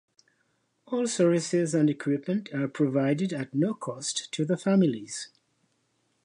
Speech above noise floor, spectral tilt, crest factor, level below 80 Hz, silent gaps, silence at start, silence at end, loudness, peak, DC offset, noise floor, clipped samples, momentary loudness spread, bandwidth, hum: 46 dB; -5.5 dB/octave; 16 dB; -76 dBFS; none; 0.9 s; 0.95 s; -27 LUFS; -12 dBFS; under 0.1%; -73 dBFS; under 0.1%; 9 LU; 11 kHz; none